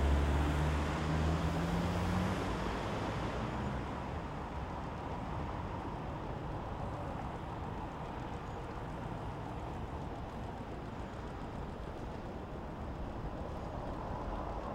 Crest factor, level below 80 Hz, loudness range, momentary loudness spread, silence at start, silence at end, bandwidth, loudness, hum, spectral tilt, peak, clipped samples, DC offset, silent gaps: 18 dB; -42 dBFS; 8 LU; 10 LU; 0 s; 0 s; 13 kHz; -39 LUFS; none; -7 dB/octave; -20 dBFS; under 0.1%; under 0.1%; none